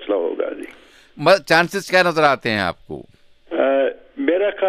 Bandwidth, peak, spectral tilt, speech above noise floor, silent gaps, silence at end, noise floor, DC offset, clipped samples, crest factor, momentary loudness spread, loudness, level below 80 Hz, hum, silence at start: 15.5 kHz; -2 dBFS; -4.5 dB/octave; 20 dB; none; 0 s; -38 dBFS; under 0.1%; under 0.1%; 18 dB; 20 LU; -18 LUFS; -56 dBFS; none; 0 s